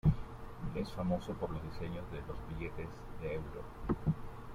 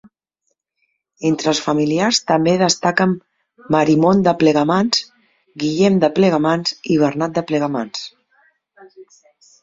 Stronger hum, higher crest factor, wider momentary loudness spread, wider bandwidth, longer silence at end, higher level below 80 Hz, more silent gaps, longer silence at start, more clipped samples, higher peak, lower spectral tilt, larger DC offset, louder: neither; about the same, 20 dB vs 16 dB; about the same, 9 LU vs 10 LU; first, 14 kHz vs 7.8 kHz; second, 0 s vs 0.6 s; first, -48 dBFS vs -58 dBFS; neither; second, 0.05 s vs 1.2 s; neither; second, -18 dBFS vs -2 dBFS; first, -8.5 dB/octave vs -5 dB/octave; neither; second, -41 LUFS vs -17 LUFS